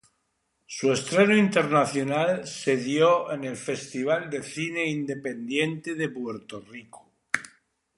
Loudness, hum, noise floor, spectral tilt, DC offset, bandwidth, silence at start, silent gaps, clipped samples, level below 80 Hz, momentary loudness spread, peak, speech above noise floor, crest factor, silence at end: -25 LUFS; none; -75 dBFS; -5 dB/octave; under 0.1%; 11.5 kHz; 0.7 s; none; under 0.1%; -70 dBFS; 14 LU; -2 dBFS; 50 dB; 24 dB; 0.5 s